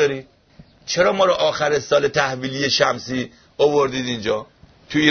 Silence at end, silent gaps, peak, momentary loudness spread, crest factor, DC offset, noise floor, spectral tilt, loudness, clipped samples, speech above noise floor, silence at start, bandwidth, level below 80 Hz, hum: 0 s; none; 0 dBFS; 10 LU; 20 dB; under 0.1%; -49 dBFS; -4 dB/octave; -19 LUFS; under 0.1%; 30 dB; 0 s; 6.6 kHz; -54 dBFS; none